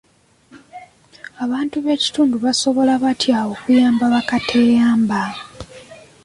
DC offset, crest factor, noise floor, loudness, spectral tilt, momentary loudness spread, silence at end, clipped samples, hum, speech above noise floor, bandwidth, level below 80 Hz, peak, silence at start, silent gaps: under 0.1%; 14 dB; -52 dBFS; -17 LUFS; -4 dB/octave; 15 LU; 0.3 s; under 0.1%; none; 36 dB; 11.5 kHz; -54 dBFS; -4 dBFS; 0.55 s; none